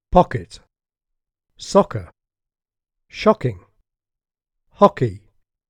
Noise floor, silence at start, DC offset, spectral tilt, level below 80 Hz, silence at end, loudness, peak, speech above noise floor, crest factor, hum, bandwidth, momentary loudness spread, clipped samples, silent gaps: -81 dBFS; 0.1 s; under 0.1%; -6.5 dB/octave; -40 dBFS; 0.5 s; -19 LUFS; 0 dBFS; 64 dB; 22 dB; none; 10.5 kHz; 21 LU; under 0.1%; none